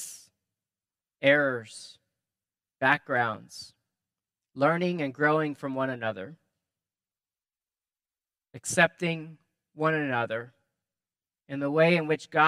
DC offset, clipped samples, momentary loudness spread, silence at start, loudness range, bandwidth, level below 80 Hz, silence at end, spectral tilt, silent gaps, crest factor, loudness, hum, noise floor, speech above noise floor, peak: under 0.1%; under 0.1%; 21 LU; 0 s; 4 LU; 15 kHz; -78 dBFS; 0 s; -5 dB/octave; none; 24 dB; -27 LUFS; none; under -90 dBFS; over 63 dB; -6 dBFS